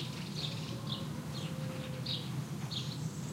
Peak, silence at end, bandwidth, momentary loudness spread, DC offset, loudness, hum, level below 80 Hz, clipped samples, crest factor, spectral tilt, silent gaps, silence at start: -24 dBFS; 0 s; 16 kHz; 3 LU; under 0.1%; -39 LUFS; none; -64 dBFS; under 0.1%; 16 dB; -5 dB/octave; none; 0 s